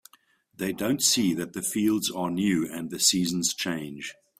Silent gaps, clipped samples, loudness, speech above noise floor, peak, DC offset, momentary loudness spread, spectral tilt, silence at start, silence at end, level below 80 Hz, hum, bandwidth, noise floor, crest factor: none; under 0.1%; -25 LUFS; 36 dB; -6 dBFS; under 0.1%; 11 LU; -3 dB/octave; 0.6 s; 0.25 s; -64 dBFS; none; 16 kHz; -62 dBFS; 20 dB